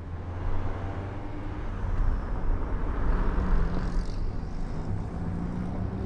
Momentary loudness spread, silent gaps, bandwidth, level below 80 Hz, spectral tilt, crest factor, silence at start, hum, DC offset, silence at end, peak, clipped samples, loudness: 7 LU; none; 6.2 kHz; -30 dBFS; -8.5 dB/octave; 14 dB; 0 s; none; under 0.1%; 0 s; -14 dBFS; under 0.1%; -33 LUFS